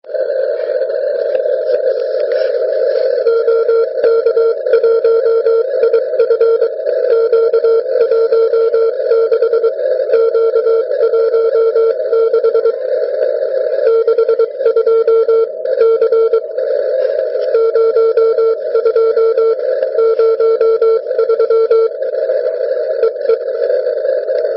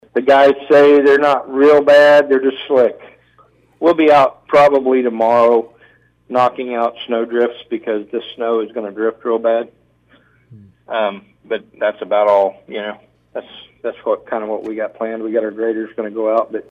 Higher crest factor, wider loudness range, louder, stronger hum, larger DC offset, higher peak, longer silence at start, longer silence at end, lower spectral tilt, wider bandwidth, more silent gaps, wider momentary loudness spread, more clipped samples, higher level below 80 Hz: about the same, 10 dB vs 12 dB; second, 2 LU vs 10 LU; about the same, -13 LUFS vs -15 LUFS; neither; neither; about the same, -2 dBFS vs -4 dBFS; about the same, 0.05 s vs 0.15 s; about the same, 0 s vs 0.1 s; about the same, -6.5 dB/octave vs -5.5 dB/octave; second, 5.6 kHz vs 8.6 kHz; neither; second, 5 LU vs 15 LU; neither; second, -74 dBFS vs -60 dBFS